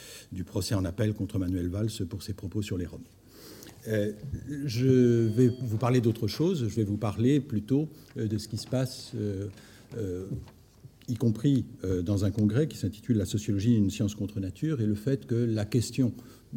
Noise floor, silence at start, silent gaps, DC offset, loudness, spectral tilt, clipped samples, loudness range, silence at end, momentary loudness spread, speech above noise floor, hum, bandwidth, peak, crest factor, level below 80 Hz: -53 dBFS; 0 s; none; under 0.1%; -29 LUFS; -7 dB/octave; under 0.1%; 7 LU; 0 s; 12 LU; 25 dB; none; 17 kHz; -10 dBFS; 18 dB; -58 dBFS